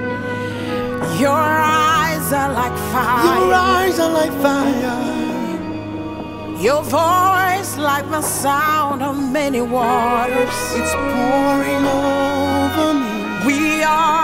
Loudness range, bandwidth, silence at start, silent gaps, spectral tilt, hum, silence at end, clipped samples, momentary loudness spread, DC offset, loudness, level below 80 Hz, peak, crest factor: 3 LU; 16.5 kHz; 0 s; none; -4.5 dB/octave; none; 0 s; under 0.1%; 9 LU; under 0.1%; -17 LUFS; -42 dBFS; 0 dBFS; 16 dB